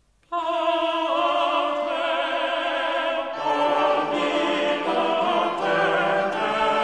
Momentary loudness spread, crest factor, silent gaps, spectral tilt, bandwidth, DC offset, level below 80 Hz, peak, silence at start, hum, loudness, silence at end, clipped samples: 4 LU; 14 dB; none; -4 dB/octave; 10.5 kHz; 0.1%; -62 dBFS; -8 dBFS; 0.3 s; none; -23 LUFS; 0 s; under 0.1%